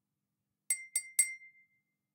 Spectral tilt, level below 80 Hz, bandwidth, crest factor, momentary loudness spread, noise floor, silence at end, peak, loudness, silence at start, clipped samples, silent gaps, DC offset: 5.5 dB/octave; under -90 dBFS; 16.5 kHz; 26 dB; 7 LU; -87 dBFS; 0.65 s; -12 dBFS; -32 LUFS; 0.7 s; under 0.1%; none; under 0.1%